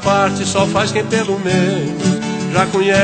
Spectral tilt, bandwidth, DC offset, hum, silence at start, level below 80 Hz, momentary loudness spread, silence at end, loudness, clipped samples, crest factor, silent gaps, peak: -5 dB/octave; 9.2 kHz; under 0.1%; none; 0 s; -46 dBFS; 3 LU; 0 s; -16 LUFS; under 0.1%; 14 dB; none; 0 dBFS